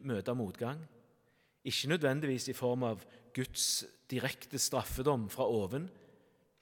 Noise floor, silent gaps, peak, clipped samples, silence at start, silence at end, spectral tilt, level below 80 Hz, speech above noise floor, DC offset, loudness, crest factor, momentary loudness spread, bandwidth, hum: -72 dBFS; none; -18 dBFS; under 0.1%; 0 s; 0.55 s; -4 dB/octave; -58 dBFS; 37 dB; under 0.1%; -35 LUFS; 20 dB; 10 LU; 18 kHz; none